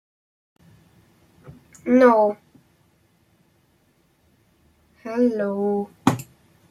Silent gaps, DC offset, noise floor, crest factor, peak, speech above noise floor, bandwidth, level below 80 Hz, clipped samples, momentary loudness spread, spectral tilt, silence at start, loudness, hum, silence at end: none; under 0.1%; -63 dBFS; 22 dB; -2 dBFS; 44 dB; 14.5 kHz; -66 dBFS; under 0.1%; 21 LU; -7 dB/octave; 1.45 s; -20 LUFS; none; 0.45 s